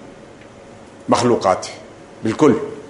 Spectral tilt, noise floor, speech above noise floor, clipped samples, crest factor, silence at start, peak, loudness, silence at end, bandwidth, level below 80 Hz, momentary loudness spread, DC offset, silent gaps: -5.5 dB/octave; -40 dBFS; 24 dB; under 0.1%; 18 dB; 0 s; 0 dBFS; -17 LUFS; 0 s; 11 kHz; -52 dBFS; 17 LU; under 0.1%; none